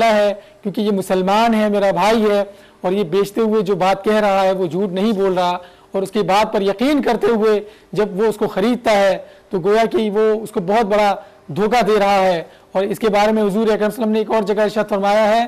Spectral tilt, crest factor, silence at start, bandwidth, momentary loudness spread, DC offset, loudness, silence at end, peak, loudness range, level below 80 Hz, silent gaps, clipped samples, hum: -5.5 dB/octave; 8 dB; 0 s; 15 kHz; 7 LU; under 0.1%; -17 LUFS; 0 s; -8 dBFS; 1 LU; -50 dBFS; none; under 0.1%; none